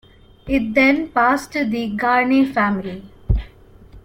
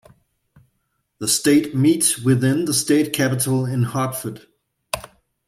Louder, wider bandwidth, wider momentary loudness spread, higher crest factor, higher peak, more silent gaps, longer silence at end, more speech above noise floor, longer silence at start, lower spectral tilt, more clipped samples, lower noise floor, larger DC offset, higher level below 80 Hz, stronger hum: about the same, -18 LUFS vs -19 LUFS; about the same, 16.5 kHz vs 16 kHz; second, 9 LU vs 14 LU; about the same, 16 dB vs 18 dB; about the same, -4 dBFS vs -2 dBFS; neither; second, 0.05 s vs 0.4 s; second, 26 dB vs 53 dB; second, 0.45 s vs 1.2 s; first, -6.5 dB/octave vs -4.5 dB/octave; neither; second, -44 dBFS vs -71 dBFS; neither; first, -32 dBFS vs -58 dBFS; neither